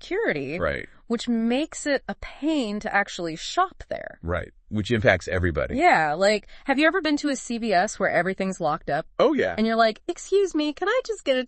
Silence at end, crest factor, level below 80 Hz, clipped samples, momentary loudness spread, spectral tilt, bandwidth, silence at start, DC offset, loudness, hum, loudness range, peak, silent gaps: 0 s; 22 dB; -48 dBFS; under 0.1%; 10 LU; -5 dB/octave; 8.8 kHz; 0.05 s; under 0.1%; -24 LUFS; none; 4 LU; -2 dBFS; none